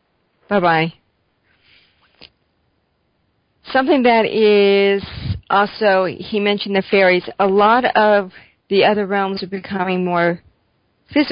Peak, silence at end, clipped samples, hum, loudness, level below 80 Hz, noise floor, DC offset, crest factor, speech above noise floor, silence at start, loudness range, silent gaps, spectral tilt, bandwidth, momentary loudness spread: -2 dBFS; 0 s; under 0.1%; none; -16 LUFS; -46 dBFS; -65 dBFS; under 0.1%; 16 dB; 50 dB; 0.5 s; 8 LU; none; -10.5 dB/octave; 5.4 kHz; 9 LU